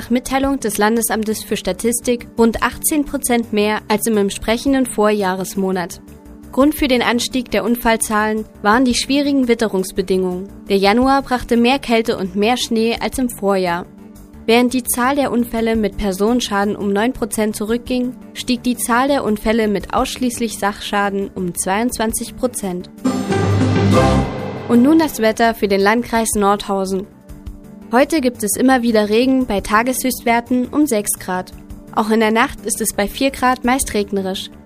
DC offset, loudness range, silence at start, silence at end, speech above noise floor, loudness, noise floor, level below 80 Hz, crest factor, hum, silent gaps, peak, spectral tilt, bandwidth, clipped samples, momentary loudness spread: under 0.1%; 3 LU; 0 s; 0.05 s; 21 dB; -17 LUFS; -38 dBFS; -38 dBFS; 16 dB; none; none; 0 dBFS; -4.5 dB/octave; 15.5 kHz; under 0.1%; 7 LU